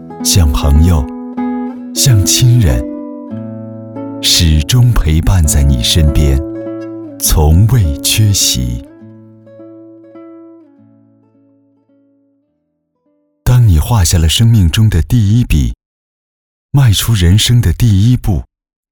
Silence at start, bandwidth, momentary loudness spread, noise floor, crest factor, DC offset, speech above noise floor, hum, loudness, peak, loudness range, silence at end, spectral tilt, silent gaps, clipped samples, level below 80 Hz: 0 s; over 20 kHz; 15 LU; -65 dBFS; 12 dB; under 0.1%; 57 dB; none; -11 LUFS; 0 dBFS; 5 LU; 0.5 s; -4.5 dB/octave; 15.86-16.69 s; under 0.1%; -20 dBFS